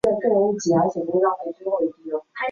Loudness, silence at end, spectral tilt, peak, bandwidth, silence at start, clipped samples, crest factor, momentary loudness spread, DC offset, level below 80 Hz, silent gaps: -22 LUFS; 0 s; -6 dB/octave; -8 dBFS; 10.5 kHz; 0.05 s; under 0.1%; 14 dB; 9 LU; under 0.1%; -60 dBFS; none